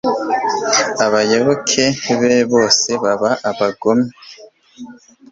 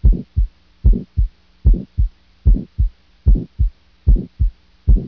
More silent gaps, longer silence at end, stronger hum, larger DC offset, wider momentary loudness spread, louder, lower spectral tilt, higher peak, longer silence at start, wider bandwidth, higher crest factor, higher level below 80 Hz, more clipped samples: neither; first, 0.4 s vs 0 s; neither; neither; about the same, 5 LU vs 5 LU; first, -15 LUFS vs -21 LUFS; second, -3 dB/octave vs -12 dB/octave; about the same, 0 dBFS vs -2 dBFS; about the same, 0.05 s vs 0 s; first, 7.8 kHz vs 1 kHz; about the same, 16 dB vs 14 dB; second, -56 dBFS vs -16 dBFS; neither